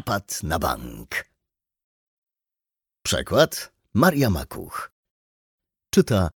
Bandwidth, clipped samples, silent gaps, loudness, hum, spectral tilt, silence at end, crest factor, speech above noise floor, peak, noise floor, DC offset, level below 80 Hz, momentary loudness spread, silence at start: 19 kHz; under 0.1%; 1.84-2.22 s, 4.92-5.03 s, 5.11-5.58 s; -23 LUFS; none; -5 dB/octave; 0.05 s; 22 dB; 67 dB; -4 dBFS; -89 dBFS; under 0.1%; -44 dBFS; 14 LU; 0.05 s